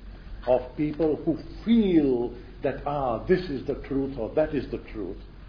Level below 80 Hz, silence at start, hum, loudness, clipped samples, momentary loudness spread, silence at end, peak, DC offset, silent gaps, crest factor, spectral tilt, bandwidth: -42 dBFS; 0 s; none; -27 LUFS; under 0.1%; 13 LU; 0 s; -8 dBFS; 0.1%; none; 18 dB; -9.5 dB/octave; 5.4 kHz